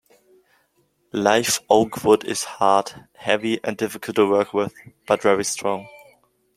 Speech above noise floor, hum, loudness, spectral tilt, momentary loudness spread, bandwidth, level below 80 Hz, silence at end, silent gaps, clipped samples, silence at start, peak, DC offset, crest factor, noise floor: 45 dB; none; -21 LUFS; -3.5 dB/octave; 10 LU; 16 kHz; -62 dBFS; 0.6 s; none; under 0.1%; 1.15 s; -2 dBFS; under 0.1%; 20 dB; -66 dBFS